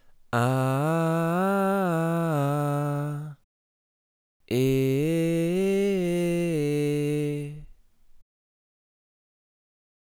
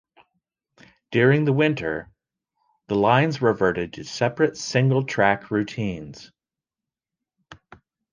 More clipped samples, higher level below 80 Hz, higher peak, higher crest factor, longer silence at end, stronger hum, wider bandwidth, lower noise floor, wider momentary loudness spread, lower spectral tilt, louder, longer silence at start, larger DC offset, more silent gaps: neither; about the same, -58 dBFS vs -56 dBFS; second, -12 dBFS vs -4 dBFS; about the same, 16 dB vs 20 dB; first, 1.9 s vs 0.6 s; neither; first, 18.5 kHz vs 9.4 kHz; second, -53 dBFS vs -89 dBFS; second, 7 LU vs 11 LU; about the same, -7 dB/octave vs -6 dB/octave; second, -25 LUFS vs -22 LUFS; second, 0.3 s vs 1.1 s; neither; first, 3.44-4.40 s vs none